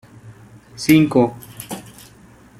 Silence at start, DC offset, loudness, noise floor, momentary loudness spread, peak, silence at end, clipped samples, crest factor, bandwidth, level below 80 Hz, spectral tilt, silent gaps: 0.25 s; under 0.1%; -16 LUFS; -46 dBFS; 20 LU; -2 dBFS; 0.8 s; under 0.1%; 18 dB; 16 kHz; -52 dBFS; -6 dB/octave; none